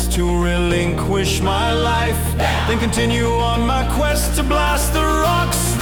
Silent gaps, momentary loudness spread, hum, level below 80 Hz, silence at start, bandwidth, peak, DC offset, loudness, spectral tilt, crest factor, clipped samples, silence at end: none; 2 LU; none; -22 dBFS; 0 s; 18 kHz; -4 dBFS; under 0.1%; -17 LUFS; -4.5 dB/octave; 12 dB; under 0.1%; 0 s